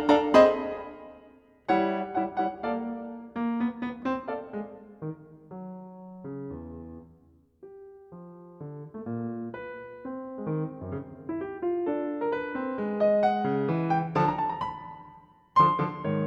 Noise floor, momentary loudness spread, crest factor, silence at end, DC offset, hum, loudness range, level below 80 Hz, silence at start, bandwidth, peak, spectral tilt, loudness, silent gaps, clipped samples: -60 dBFS; 22 LU; 22 dB; 0 s; under 0.1%; none; 16 LU; -60 dBFS; 0 s; 8 kHz; -6 dBFS; -7.5 dB/octave; -28 LUFS; none; under 0.1%